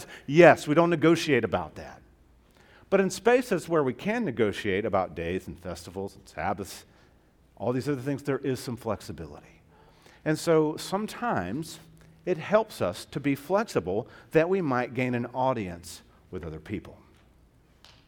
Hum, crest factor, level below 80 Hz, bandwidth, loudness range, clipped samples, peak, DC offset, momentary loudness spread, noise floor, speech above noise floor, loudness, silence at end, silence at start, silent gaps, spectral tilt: none; 26 dB; -58 dBFS; 18 kHz; 7 LU; under 0.1%; -2 dBFS; under 0.1%; 17 LU; -60 dBFS; 34 dB; -27 LUFS; 1.15 s; 0 s; none; -6 dB/octave